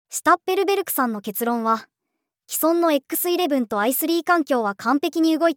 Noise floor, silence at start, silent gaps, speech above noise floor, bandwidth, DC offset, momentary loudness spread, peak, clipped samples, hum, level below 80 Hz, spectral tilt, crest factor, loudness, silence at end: -80 dBFS; 0.1 s; none; 60 dB; over 20 kHz; under 0.1%; 5 LU; -4 dBFS; under 0.1%; none; -76 dBFS; -3 dB/octave; 18 dB; -21 LUFS; 0.05 s